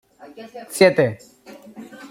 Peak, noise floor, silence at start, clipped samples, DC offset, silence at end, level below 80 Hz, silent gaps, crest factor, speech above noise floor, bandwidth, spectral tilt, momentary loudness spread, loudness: -2 dBFS; -40 dBFS; 0.4 s; under 0.1%; under 0.1%; 0.05 s; -62 dBFS; none; 20 dB; 20 dB; 16.5 kHz; -5 dB/octave; 25 LU; -17 LUFS